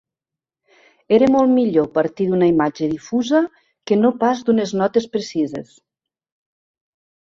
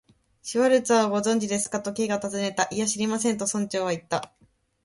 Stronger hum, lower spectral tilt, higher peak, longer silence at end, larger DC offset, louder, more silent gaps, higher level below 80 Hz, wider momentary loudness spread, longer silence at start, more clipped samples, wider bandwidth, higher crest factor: neither; first, -6.5 dB/octave vs -3.5 dB/octave; first, -2 dBFS vs -8 dBFS; first, 1.75 s vs 0.6 s; neither; first, -18 LUFS vs -25 LUFS; neither; first, -58 dBFS vs -66 dBFS; about the same, 9 LU vs 9 LU; first, 1.1 s vs 0.45 s; neither; second, 7.6 kHz vs 11.5 kHz; about the same, 18 dB vs 18 dB